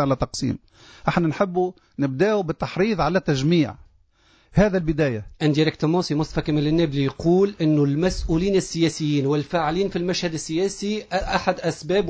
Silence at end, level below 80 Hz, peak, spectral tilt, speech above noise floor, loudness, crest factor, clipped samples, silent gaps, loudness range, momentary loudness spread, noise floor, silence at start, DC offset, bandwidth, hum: 0 s; -40 dBFS; -4 dBFS; -6 dB/octave; 37 dB; -22 LUFS; 16 dB; under 0.1%; none; 2 LU; 6 LU; -59 dBFS; 0 s; under 0.1%; 8 kHz; none